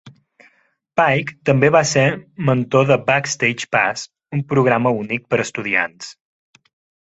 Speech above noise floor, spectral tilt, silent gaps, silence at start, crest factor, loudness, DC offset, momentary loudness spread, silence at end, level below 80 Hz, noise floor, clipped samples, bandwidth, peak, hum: 43 dB; -5 dB/octave; none; 0.05 s; 18 dB; -17 LUFS; under 0.1%; 11 LU; 0.9 s; -56 dBFS; -61 dBFS; under 0.1%; 8.2 kHz; -2 dBFS; none